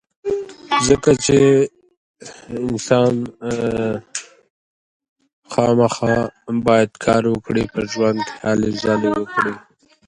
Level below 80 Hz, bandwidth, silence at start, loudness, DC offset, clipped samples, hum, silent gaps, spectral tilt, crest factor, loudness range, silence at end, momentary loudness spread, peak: -46 dBFS; 11 kHz; 0.25 s; -18 LUFS; under 0.1%; under 0.1%; none; 1.97-2.14 s, 4.50-5.00 s, 5.09-5.16 s, 5.33-5.42 s; -5 dB/octave; 18 dB; 5 LU; 0.5 s; 11 LU; 0 dBFS